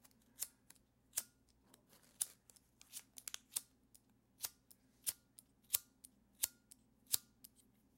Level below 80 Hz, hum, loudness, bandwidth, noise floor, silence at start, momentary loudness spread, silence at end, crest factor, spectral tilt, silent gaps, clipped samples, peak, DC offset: -82 dBFS; none; -44 LUFS; 16.5 kHz; -73 dBFS; 0.4 s; 25 LU; 0.75 s; 38 dB; 1.5 dB/octave; none; under 0.1%; -12 dBFS; under 0.1%